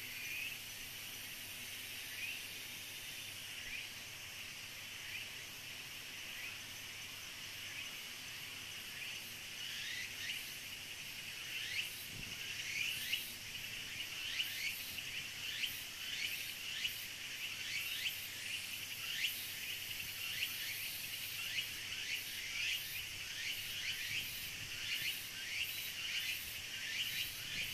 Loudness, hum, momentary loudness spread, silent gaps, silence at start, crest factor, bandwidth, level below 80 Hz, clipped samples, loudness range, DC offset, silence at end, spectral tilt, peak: -41 LUFS; none; 8 LU; none; 0 s; 22 dB; 14 kHz; -68 dBFS; under 0.1%; 6 LU; under 0.1%; 0 s; 0.5 dB/octave; -22 dBFS